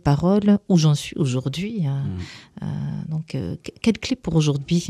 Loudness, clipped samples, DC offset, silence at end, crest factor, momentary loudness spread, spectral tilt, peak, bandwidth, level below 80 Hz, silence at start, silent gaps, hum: -22 LUFS; under 0.1%; under 0.1%; 0 s; 18 dB; 13 LU; -6.5 dB/octave; -4 dBFS; 13 kHz; -46 dBFS; 0.05 s; none; none